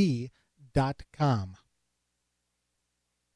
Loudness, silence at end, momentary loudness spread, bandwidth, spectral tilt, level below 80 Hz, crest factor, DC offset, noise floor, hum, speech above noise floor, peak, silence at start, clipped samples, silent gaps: -30 LUFS; 1.8 s; 13 LU; 10.5 kHz; -7.5 dB/octave; -54 dBFS; 18 dB; under 0.1%; -80 dBFS; 60 Hz at -55 dBFS; 52 dB; -14 dBFS; 0 s; under 0.1%; none